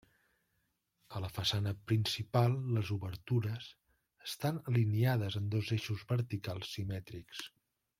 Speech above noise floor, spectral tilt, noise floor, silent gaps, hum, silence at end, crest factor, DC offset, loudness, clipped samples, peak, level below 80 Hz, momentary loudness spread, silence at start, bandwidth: 46 dB; -6 dB/octave; -81 dBFS; none; none; 0.5 s; 20 dB; under 0.1%; -35 LUFS; under 0.1%; -16 dBFS; -66 dBFS; 14 LU; 1.1 s; 16 kHz